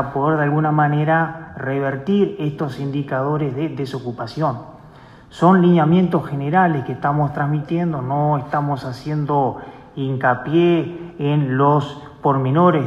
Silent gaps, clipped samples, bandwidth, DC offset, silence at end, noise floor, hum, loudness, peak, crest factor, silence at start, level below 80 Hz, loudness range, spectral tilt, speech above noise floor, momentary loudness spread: none; under 0.1%; 7.6 kHz; under 0.1%; 0 s; -43 dBFS; none; -19 LUFS; -2 dBFS; 16 dB; 0 s; -52 dBFS; 5 LU; -9 dB/octave; 25 dB; 10 LU